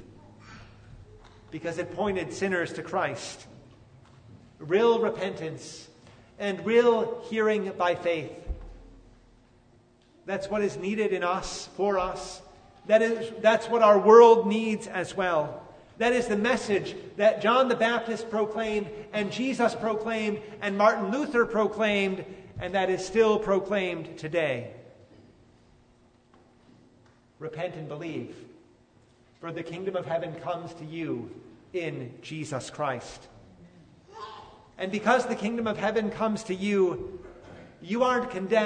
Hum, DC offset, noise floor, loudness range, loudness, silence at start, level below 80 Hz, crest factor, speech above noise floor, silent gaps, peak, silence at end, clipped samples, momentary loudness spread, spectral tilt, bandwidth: none; under 0.1%; -61 dBFS; 15 LU; -26 LUFS; 0 s; -54 dBFS; 24 dB; 35 dB; none; -4 dBFS; 0 s; under 0.1%; 18 LU; -5 dB/octave; 9.6 kHz